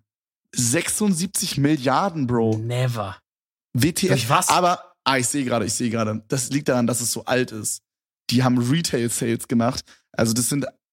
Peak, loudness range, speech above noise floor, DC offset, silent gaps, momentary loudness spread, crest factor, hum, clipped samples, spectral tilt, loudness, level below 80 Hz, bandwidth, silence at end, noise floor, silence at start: -2 dBFS; 2 LU; over 69 dB; under 0.1%; 3.32-3.56 s; 8 LU; 20 dB; none; under 0.1%; -4.5 dB/octave; -21 LUFS; -56 dBFS; 16.5 kHz; 0.2 s; under -90 dBFS; 0.55 s